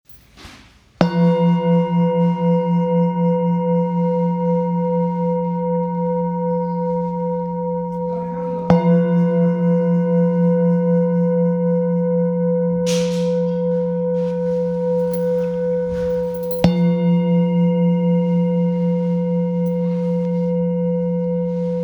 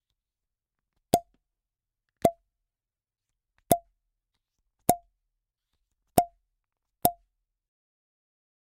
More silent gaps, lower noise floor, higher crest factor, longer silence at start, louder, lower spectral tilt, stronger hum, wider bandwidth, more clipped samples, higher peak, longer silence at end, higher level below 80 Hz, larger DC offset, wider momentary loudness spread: neither; second, -46 dBFS vs under -90 dBFS; second, 18 dB vs 32 dB; second, 0.1 s vs 1.15 s; first, -18 LUFS vs -29 LUFS; first, -9 dB/octave vs -4.5 dB/octave; neither; first, over 20 kHz vs 15.5 kHz; neither; about the same, 0 dBFS vs -2 dBFS; second, 0 s vs 1.55 s; first, -50 dBFS vs -58 dBFS; neither; first, 5 LU vs 2 LU